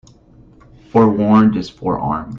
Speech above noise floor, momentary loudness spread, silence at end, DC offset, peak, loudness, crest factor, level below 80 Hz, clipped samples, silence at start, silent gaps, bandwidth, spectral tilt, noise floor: 32 dB; 10 LU; 0 s; under 0.1%; -2 dBFS; -15 LUFS; 16 dB; -44 dBFS; under 0.1%; 0.95 s; none; 7 kHz; -8.5 dB/octave; -46 dBFS